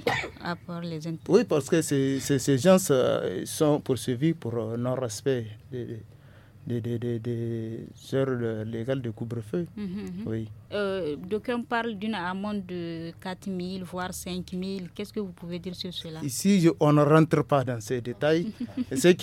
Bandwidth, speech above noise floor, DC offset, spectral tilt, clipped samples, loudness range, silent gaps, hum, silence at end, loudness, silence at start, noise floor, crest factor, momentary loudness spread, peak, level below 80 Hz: 17 kHz; 24 dB; under 0.1%; -6 dB/octave; under 0.1%; 9 LU; none; none; 0 s; -28 LUFS; 0 s; -51 dBFS; 20 dB; 14 LU; -6 dBFS; -58 dBFS